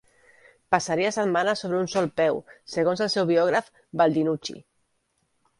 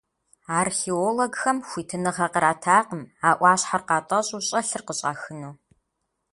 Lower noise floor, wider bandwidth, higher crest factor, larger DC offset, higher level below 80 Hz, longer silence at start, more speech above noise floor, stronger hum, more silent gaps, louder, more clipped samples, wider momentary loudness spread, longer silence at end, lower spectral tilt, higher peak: second, -72 dBFS vs -78 dBFS; about the same, 11.5 kHz vs 11.5 kHz; about the same, 22 dB vs 22 dB; neither; about the same, -66 dBFS vs -66 dBFS; first, 0.7 s vs 0.5 s; second, 48 dB vs 54 dB; neither; neither; about the same, -24 LUFS vs -23 LUFS; neither; about the same, 11 LU vs 12 LU; first, 1 s vs 0.8 s; first, -5 dB/octave vs -3.5 dB/octave; about the same, -4 dBFS vs -4 dBFS